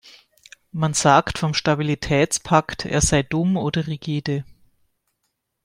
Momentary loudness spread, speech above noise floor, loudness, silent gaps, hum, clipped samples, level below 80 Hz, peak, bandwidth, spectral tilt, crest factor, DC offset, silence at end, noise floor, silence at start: 9 LU; 55 dB; -20 LUFS; none; none; under 0.1%; -42 dBFS; -2 dBFS; 16 kHz; -4.5 dB/octave; 20 dB; under 0.1%; 1.2 s; -75 dBFS; 0.05 s